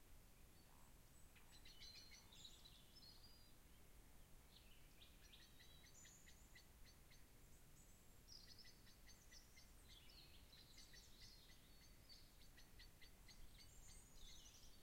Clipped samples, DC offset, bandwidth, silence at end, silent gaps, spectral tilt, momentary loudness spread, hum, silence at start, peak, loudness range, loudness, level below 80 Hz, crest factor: under 0.1%; under 0.1%; 16 kHz; 0 s; none; -2.5 dB/octave; 7 LU; none; 0 s; -48 dBFS; 3 LU; -66 LUFS; -70 dBFS; 16 dB